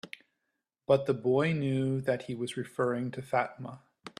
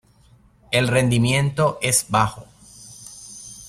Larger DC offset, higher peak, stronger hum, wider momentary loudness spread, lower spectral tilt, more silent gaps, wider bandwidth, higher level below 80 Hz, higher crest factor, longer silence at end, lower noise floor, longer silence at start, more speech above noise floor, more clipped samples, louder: neither; second, -12 dBFS vs -4 dBFS; neither; second, 18 LU vs 21 LU; first, -7 dB/octave vs -4 dB/octave; neither; second, 13 kHz vs 15.5 kHz; second, -70 dBFS vs -48 dBFS; about the same, 20 dB vs 18 dB; about the same, 0.1 s vs 0 s; first, -84 dBFS vs -54 dBFS; second, 0.05 s vs 0.7 s; first, 54 dB vs 35 dB; neither; second, -31 LUFS vs -19 LUFS